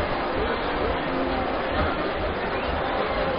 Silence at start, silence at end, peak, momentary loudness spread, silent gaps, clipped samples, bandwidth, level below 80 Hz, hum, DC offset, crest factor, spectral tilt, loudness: 0 s; 0 s; -10 dBFS; 2 LU; none; under 0.1%; 5.2 kHz; -36 dBFS; none; under 0.1%; 16 dB; -3.5 dB/octave; -26 LUFS